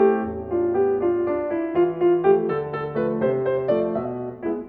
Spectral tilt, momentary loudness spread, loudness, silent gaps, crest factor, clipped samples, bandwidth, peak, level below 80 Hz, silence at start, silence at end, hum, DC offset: -11 dB/octave; 8 LU; -22 LUFS; none; 16 dB; under 0.1%; 4.3 kHz; -6 dBFS; -54 dBFS; 0 s; 0 s; none; under 0.1%